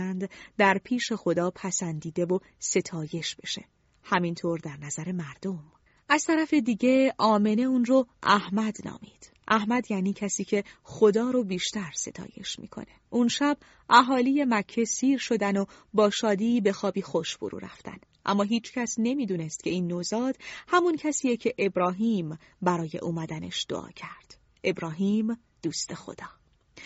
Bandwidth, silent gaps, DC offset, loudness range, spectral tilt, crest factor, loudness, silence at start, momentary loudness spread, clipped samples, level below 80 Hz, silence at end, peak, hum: 8 kHz; none; under 0.1%; 7 LU; -4 dB/octave; 24 dB; -27 LUFS; 0 s; 13 LU; under 0.1%; -66 dBFS; 0 s; -4 dBFS; none